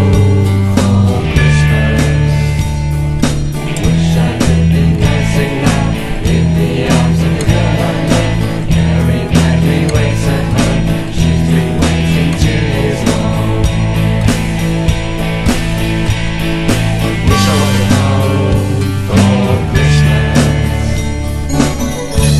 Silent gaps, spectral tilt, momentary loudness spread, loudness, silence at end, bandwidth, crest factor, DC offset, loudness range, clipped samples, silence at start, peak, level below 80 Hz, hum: none; -6 dB/octave; 5 LU; -12 LUFS; 0 s; 13.5 kHz; 10 dB; under 0.1%; 2 LU; under 0.1%; 0 s; 0 dBFS; -20 dBFS; none